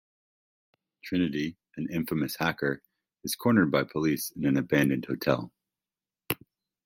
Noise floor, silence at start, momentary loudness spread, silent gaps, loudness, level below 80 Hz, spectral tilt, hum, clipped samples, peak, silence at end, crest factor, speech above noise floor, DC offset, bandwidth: under -90 dBFS; 1.05 s; 12 LU; none; -29 LUFS; -62 dBFS; -5.5 dB/octave; none; under 0.1%; -8 dBFS; 0.5 s; 22 dB; over 63 dB; under 0.1%; 16.5 kHz